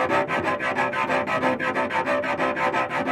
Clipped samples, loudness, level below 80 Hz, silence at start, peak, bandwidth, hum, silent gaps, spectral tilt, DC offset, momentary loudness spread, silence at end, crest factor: under 0.1%; -23 LUFS; -62 dBFS; 0 s; -8 dBFS; 14 kHz; none; none; -5 dB/octave; under 0.1%; 2 LU; 0 s; 16 dB